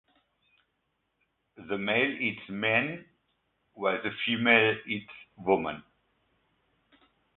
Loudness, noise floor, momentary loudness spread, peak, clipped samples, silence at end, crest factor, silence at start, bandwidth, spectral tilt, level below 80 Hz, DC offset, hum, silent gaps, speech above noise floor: -28 LUFS; -78 dBFS; 15 LU; -6 dBFS; under 0.1%; 1.55 s; 26 dB; 1.6 s; 4.2 kHz; -8.5 dB/octave; -68 dBFS; under 0.1%; none; none; 50 dB